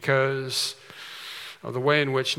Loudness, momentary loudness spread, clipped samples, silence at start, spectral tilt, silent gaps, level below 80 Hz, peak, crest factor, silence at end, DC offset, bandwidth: -25 LUFS; 16 LU; under 0.1%; 0 s; -4 dB/octave; none; -78 dBFS; -6 dBFS; 20 dB; 0 s; under 0.1%; 17 kHz